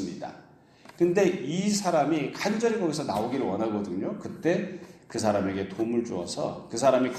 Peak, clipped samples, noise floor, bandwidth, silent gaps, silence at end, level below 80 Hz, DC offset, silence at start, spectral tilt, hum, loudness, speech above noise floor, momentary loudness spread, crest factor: -8 dBFS; under 0.1%; -54 dBFS; 14.5 kHz; none; 0 s; -66 dBFS; under 0.1%; 0 s; -5 dB/octave; none; -28 LUFS; 27 dB; 10 LU; 18 dB